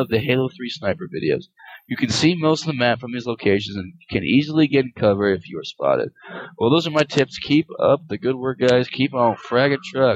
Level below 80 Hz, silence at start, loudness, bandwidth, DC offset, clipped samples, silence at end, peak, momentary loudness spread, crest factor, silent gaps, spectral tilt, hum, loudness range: -56 dBFS; 0 s; -20 LUFS; 14.5 kHz; under 0.1%; under 0.1%; 0 s; -2 dBFS; 9 LU; 18 dB; none; -6 dB/octave; none; 2 LU